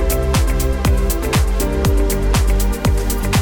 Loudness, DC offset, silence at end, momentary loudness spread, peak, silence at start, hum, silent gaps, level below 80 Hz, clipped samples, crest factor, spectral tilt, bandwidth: -18 LUFS; under 0.1%; 0 s; 2 LU; -6 dBFS; 0 s; none; none; -16 dBFS; under 0.1%; 10 dB; -5 dB/octave; over 20 kHz